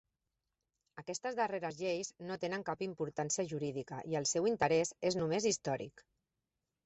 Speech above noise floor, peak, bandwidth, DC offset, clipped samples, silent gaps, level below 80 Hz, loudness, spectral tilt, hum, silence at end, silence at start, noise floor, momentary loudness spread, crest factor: 52 dB; -18 dBFS; 8.2 kHz; under 0.1%; under 0.1%; none; -74 dBFS; -36 LUFS; -4 dB/octave; none; 0.85 s; 0.95 s; -89 dBFS; 10 LU; 20 dB